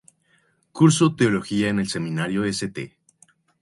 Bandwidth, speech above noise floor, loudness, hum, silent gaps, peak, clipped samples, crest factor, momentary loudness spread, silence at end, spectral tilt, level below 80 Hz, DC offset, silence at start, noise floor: 11.5 kHz; 43 dB; -21 LUFS; none; none; -4 dBFS; under 0.1%; 20 dB; 17 LU; 0.75 s; -5.5 dB/octave; -56 dBFS; under 0.1%; 0.75 s; -64 dBFS